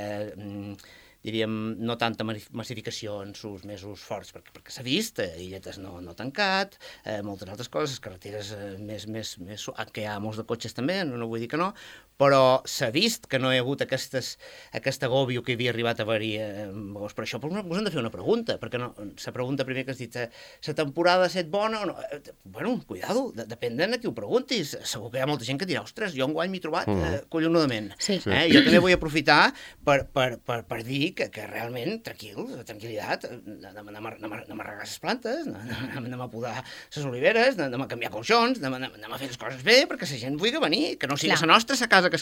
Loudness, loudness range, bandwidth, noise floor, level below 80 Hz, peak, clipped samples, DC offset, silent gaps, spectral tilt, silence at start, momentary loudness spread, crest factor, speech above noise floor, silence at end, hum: -26 LUFS; 12 LU; 17.5 kHz; -51 dBFS; -58 dBFS; -2 dBFS; under 0.1%; under 0.1%; none; -4.5 dB/octave; 0 s; 18 LU; 24 dB; 24 dB; 0 s; none